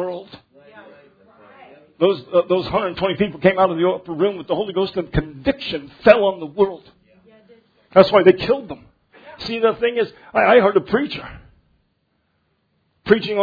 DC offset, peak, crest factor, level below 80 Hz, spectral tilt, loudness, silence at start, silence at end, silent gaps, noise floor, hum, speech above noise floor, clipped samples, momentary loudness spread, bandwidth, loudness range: under 0.1%; 0 dBFS; 20 dB; -46 dBFS; -8 dB/octave; -18 LUFS; 0 s; 0 s; none; -68 dBFS; none; 50 dB; under 0.1%; 14 LU; 5.4 kHz; 3 LU